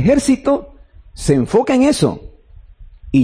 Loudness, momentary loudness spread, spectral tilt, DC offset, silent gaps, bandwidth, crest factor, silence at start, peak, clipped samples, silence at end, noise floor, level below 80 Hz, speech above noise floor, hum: -15 LUFS; 8 LU; -6 dB/octave; under 0.1%; none; 10.5 kHz; 12 dB; 0 s; -4 dBFS; under 0.1%; 0 s; -42 dBFS; -36 dBFS; 28 dB; none